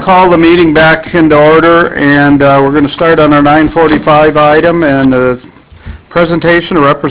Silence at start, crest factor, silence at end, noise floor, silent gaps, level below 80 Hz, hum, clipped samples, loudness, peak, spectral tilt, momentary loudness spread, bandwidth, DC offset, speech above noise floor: 0 s; 6 dB; 0 s; -27 dBFS; none; -32 dBFS; none; 4%; -6 LUFS; 0 dBFS; -10 dB/octave; 5 LU; 4 kHz; under 0.1%; 22 dB